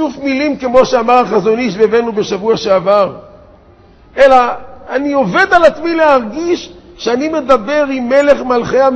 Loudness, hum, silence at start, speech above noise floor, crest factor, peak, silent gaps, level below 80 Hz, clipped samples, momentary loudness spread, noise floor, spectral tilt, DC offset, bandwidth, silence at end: -12 LUFS; none; 0 s; 31 dB; 12 dB; 0 dBFS; none; -42 dBFS; 0.2%; 9 LU; -42 dBFS; -5 dB/octave; under 0.1%; 8.4 kHz; 0 s